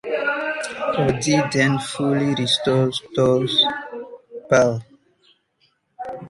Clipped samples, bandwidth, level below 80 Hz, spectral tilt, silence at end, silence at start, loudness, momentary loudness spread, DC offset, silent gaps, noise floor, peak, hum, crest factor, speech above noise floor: under 0.1%; 11.5 kHz; -52 dBFS; -4.5 dB/octave; 0 s; 0.05 s; -20 LUFS; 17 LU; under 0.1%; none; -65 dBFS; -2 dBFS; none; 18 dB; 46 dB